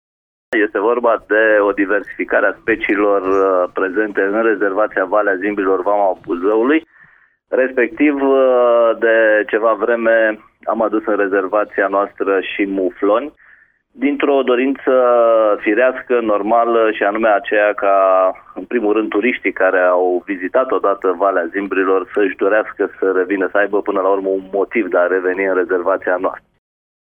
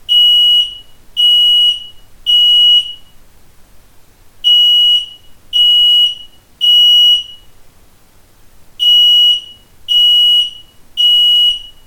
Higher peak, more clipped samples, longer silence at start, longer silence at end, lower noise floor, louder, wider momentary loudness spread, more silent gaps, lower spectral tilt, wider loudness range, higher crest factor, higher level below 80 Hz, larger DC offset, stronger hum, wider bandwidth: about the same, -2 dBFS vs -2 dBFS; neither; first, 0.5 s vs 0.1 s; first, 0.7 s vs 0.2 s; first, -50 dBFS vs -44 dBFS; second, -15 LUFS vs -7 LUFS; second, 6 LU vs 13 LU; neither; first, -7 dB/octave vs 2 dB/octave; about the same, 3 LU vs 3 LU; about the same, 14 dB vs 10 dB; second, -56 dBFS vs -46 dBFS; neither; neither; second, 3.7 kHz vs 18.5 kHz